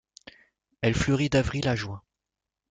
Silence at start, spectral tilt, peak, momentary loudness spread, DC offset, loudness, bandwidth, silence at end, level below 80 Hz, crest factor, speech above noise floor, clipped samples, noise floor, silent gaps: 0.8 s; -5.5 dB/octave; -10 dBFS; 12 LU; under 0.1%; -26 LUFS; 9.4 kHz; 0.7 s; -46 dBFS; 18 dB; 62 dB; under 0.1%; -88 dBFS; none